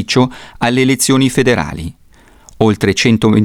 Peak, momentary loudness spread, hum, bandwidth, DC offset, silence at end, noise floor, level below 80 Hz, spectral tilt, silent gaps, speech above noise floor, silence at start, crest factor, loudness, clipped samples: 0 dBFS; 9 LU; none; 17.5 kHz; under 0.1%; 0 s; -43 dBFS; -40 dBFS; -5 dB/octave; none; 31 dB; 0 s; 12 dB; -13 LUFS; under 0.1%